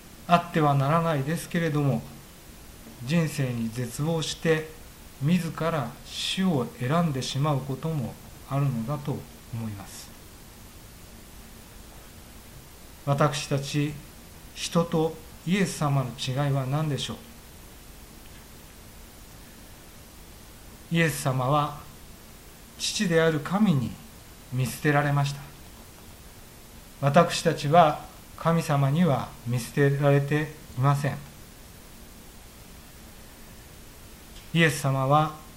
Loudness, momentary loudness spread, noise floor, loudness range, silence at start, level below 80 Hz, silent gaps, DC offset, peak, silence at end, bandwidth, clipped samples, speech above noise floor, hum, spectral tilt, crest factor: -26 LUFS; 24 LU; -47 dBFS; 13 LU; 0.05 s; -50 dBFS; none; under 0.1%; -4 dBFS; 0 s; 16 kHz; under 0.1%; 22 dB; none; -5.5 dB/octave; 24 dB